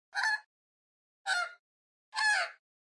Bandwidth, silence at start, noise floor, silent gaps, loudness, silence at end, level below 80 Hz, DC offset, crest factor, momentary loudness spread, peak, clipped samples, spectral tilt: 11.5 kHz; 0.15 s; under -90 dBFS; 0.46-1.25 s, 1.59-2.12 s; -32 LUFS; 0.3 s; under -90 dBFS; under 0.1%; 18 dB; 12 LU; -18 dBFS; under 0.1%; 5.5 dB/octave